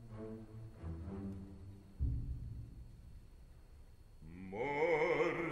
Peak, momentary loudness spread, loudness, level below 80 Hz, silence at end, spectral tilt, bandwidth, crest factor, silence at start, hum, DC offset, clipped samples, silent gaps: -22 dBFS; 26 LU; -40 LUFS; -50 dBFS; 0 s; -7.5 dB/octave; 11 kHz; 20 dB; 0 s; none; under 0.1%; under 0.1%; none